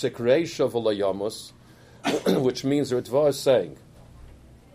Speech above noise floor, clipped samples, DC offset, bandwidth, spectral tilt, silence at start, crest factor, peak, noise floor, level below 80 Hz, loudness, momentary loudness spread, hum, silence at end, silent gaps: 25 dB; under 0.1%; under 0.1%; 15.5 kHz; -5.5 dB/octave; 0 s; 18 dB; -8 dBFS; -48 dBFS; -56 dBFS; -24 LUFS; 10 LU; none; 0.4 s; none